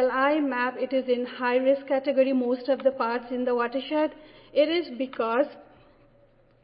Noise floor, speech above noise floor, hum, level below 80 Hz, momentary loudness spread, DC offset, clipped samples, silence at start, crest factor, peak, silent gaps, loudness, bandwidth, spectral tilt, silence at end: -59 dBFS; 34 dB; none; -66 dBFS; 5 LU; under 0.1%; under 0.1%; 0 s; 16 dB; -10 dBFS; none; -26 LUFS; 5.2 kHz; -8 dB/octave; 1 s